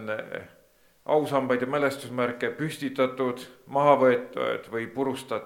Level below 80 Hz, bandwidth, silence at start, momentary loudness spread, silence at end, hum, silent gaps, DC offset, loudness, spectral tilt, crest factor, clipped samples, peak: -72 dBFS; 16.5 kHz; 0 s; 12 LU; 0 s; none; none; under 0.1%; -26 LUFS; -6 dB/octave; 22 dB; under 0.1%; -6 dBFS